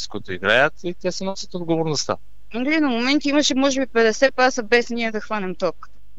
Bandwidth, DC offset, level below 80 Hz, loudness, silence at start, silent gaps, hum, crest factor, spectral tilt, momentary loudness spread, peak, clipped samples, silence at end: 8.4 kHz; 3%; -52 dBFS; -20 LUFS; 0 s; none; none; 18 dB; -3.5 dB/octave; 11 LU; -2 dBFS; under 0.1%; 0.35 s